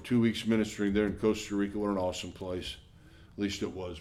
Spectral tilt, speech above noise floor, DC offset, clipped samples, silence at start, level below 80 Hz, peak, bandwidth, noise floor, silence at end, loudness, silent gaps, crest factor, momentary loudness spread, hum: -5.5 dB/octave; 24 dB; under 0.1%; under 0.1%; 0 s; -54 dBFS; -16 dBFS; 14 kHz; -55 dBFS; 0 s; -32 LUFS; none; 16 dB; 10 LU; none